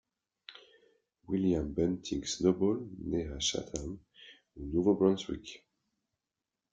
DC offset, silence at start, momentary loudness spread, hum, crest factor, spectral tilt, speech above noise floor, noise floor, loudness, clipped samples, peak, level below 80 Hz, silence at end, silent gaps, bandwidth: under 0.1%; 0.5 s; 21 LU; none; 20 dB; -5 dB/octave; 58 dB; -89 dBFS; -32 LUFS; under 0.1%; -14 dBFS; -54 dBFS; 1.15 s; none; 9.4 kHz